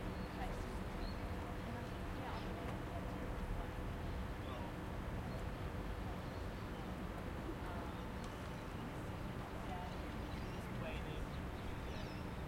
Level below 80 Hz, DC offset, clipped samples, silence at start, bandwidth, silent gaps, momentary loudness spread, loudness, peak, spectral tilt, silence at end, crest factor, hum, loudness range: -50 dBFS; under 0.1%; under 0.1%; 0 s; 16.5 kHz; none; 2 LU; -46 LUFS; -32 dBFS; -6.5 dB/octave; 0 s; 14 dB; none; 1 LU